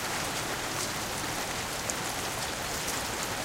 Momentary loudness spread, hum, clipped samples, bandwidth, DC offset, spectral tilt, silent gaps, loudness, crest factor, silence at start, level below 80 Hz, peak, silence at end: 1 LU; none; under 0.1%; 16.5 kHz; under 0.1%; -2 dB/octave; none; -31 LUFS; 22 dB; 0 s; -52 dBFS; -12 dBFS; 0 s